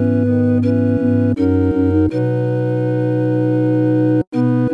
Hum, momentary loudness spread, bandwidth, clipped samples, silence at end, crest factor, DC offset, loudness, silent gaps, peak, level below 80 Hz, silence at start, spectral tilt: none; 3 LU; 5.6 kHz; under 0.1%; 0 s; 10 dB; under 0.1%; -16 LUFS; 4.27-4.32 s; -4 dBFS; -44 dBFS; 0 s; -10.5 dB/octave